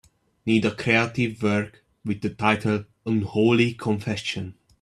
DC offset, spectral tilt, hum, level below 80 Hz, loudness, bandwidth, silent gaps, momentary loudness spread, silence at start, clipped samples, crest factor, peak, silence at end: under 0.1%; -6 dB/octave; none; -58 dBFS; -24 LUFS; 11.5 kHz; none; 12 LU; 0.45 s; under 0.1%; 20 dB; -4 dBFS; 0.3 s